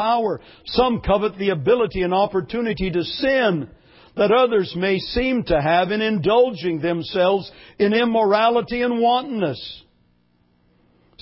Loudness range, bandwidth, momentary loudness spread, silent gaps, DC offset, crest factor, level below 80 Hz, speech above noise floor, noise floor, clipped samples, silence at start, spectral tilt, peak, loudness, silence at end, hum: 2 LU; 5.8 kHz; 8 LU; none; under 0.1%; 16 dB; -42 dBFS; 42 dB; -61 dBFS; under 0.1%; 0 s; -10 dB/octave; -4 dBFS; -20 LUFS; 1.4 s; none